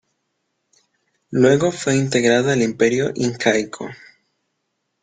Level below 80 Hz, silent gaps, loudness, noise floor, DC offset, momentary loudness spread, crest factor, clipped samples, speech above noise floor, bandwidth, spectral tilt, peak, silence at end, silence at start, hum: -58 dBFS; none; -18 LUFS; -74 dBFS; under 0.1%; 11 LU; 18 dB; under 0.1%; 56 dB; 9.6 kHz; -5 dB/octave; -2 dBFS; 1.1 s; 1.3 s; none